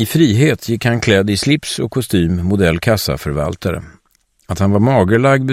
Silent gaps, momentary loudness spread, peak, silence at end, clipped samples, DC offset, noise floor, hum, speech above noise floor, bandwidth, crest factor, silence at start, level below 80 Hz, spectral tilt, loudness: none; 8 LU; 0 dBFS; 0 s; under 0.1%; under 0.1%; -59 dBFS; none; 45 dB; 16 kHz; 14 dB; 0 s; -36 dBFS; -6 dB/octave; -15 LUFS